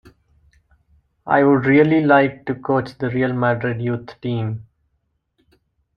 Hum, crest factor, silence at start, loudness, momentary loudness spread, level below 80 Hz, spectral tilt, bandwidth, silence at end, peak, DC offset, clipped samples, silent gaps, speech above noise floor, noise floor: none; 18 dB; 1.25 s; -18 LUFS; 13 LU; -56 dBFS; -9.5 dB/octave; 5.6 kHz; 1.35 s; -2 dBFS; under 0.1%; under 0.1%; none; 53 dB; -70 dBFS